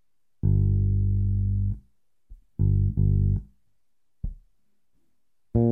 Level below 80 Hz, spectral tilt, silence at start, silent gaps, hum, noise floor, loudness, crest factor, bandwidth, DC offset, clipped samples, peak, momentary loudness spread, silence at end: -32 dBFS; -14.5 dB/octave; 0.45 s; none; none; -82 dBFS; -25 LUFS; 14 dB; 1 kHz; under 0.1%; under 0.1%; -10 dBFS; 17 LU; 0 s